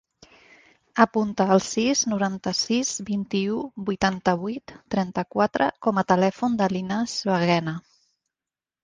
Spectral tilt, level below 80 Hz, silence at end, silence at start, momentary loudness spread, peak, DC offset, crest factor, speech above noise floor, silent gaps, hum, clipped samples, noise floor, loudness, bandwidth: -4.5 dB/octave; -58 dBFS; 1.05 s; 0.95 s; 8 LU; -2 dBFS; under 0.1%; 22 dB; over 67 dB; none; none; under 0.1%; under -90 dBFS; -24 LUFS; 9.8 kHz